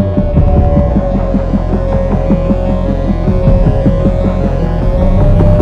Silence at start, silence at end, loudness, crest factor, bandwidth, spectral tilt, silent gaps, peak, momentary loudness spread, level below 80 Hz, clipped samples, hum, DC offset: 0 s; 0 s; -12 LUFS; 10 dB; 5.4 kHz; -10 dB/octave; none; 0 dBFS; 4 LU; -14 dBFS; 0.3%; none; under 0.1%